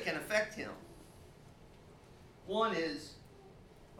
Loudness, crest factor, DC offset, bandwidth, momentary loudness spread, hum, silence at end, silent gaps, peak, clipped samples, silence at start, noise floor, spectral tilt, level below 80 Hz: -36 LUFS; 20 dB; under 0.1%; 17.5 kHz; 25 LU; none; 0 s; none; -20 dBFS; under 0.1%; 0 s; -58 dBFS; -4 dB/octave; -64 dBFS